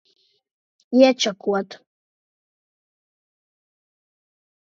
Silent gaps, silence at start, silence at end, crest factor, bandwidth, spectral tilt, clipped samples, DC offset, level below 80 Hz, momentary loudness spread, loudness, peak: none; 0.9 s; 2.9 s; 24 dB; 7.6 kHz; -4 dB/octave; under 0.1%; under 0.1%; -82 dBFS; 10 LU; -19 LUFS; -2 dBFS